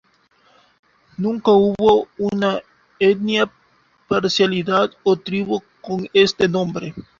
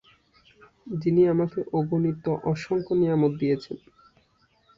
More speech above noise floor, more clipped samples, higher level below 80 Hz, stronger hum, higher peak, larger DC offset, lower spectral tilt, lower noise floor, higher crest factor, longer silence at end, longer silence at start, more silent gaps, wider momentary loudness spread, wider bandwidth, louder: about the same, 41 dB vs 41 dB; neither; first, -54 dBFS vs -60 dBFS; neither; first, -2 dBFS vs -10 dBFS; neither; second, -5.5 dB/octave vs -9 dB/octave; second, -58 dBFS vs -65 dBFS; about the same, 18 dB vs 16 dB; second, 0.2 s vs 1 s; first, 1.2 s vs 0.85 s; neither; about the same, 11 LU vs 9 LU; about the same, 7.6 kHz vs 7.4 kHz; first, -19 LUFS vs -25 LUFS